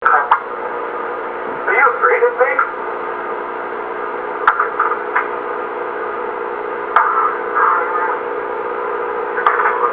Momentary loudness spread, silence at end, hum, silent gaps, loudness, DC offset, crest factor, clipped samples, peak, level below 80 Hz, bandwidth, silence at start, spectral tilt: 10 LU; 0 s; none; none; -17 LUFS; under 0.1%; 18 dB; under 0.1%; 0 dBFS; -60 dBFS; 4 kHz; 0 s; -6.5 dB/octave